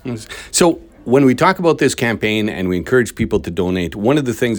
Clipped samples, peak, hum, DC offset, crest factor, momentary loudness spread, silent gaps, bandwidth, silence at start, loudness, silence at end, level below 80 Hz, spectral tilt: under 0.1%; 0 dBFS; none; under 0.1%; 16 dB; 6 LU; none; over 20 kHz; 0.05 s; -16 LUFS; 0 s; -42 dBFS; -5 dB/octave